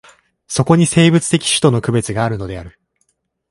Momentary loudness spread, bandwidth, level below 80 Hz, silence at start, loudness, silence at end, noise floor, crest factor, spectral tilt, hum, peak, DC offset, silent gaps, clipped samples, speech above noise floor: 13 LU; 11.5 kHz; -44 dBFS; 0.5 s; -14 LUFS; 0.8 s; -66 dBFS; 16 dB; -5 dB/octave; none; 0 dBFS; under 0.1%; none; under 0.1%; 52 dB